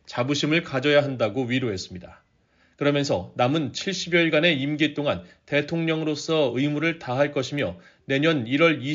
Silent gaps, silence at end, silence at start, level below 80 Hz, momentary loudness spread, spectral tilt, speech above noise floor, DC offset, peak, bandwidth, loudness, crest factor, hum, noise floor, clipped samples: none; 0 s; 0.1 s; -62 dBFS; 8 LU; -4 dB/octave; 39 dB; under 0.1%; -6 dBFS; 7.6 kHz; -23 LUFS; 18 dB; none; -63 dBFS; under 0.1%